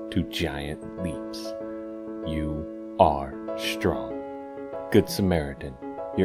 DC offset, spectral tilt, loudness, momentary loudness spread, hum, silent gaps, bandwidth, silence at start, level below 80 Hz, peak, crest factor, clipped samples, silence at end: under 0.1%; -6 dB/octave; -28 LUFS; 14 LU; none; none; 16 kHz; 0 s; -44 dBFS; -4 dBFS; 24 dB; under 0.1%; 0 s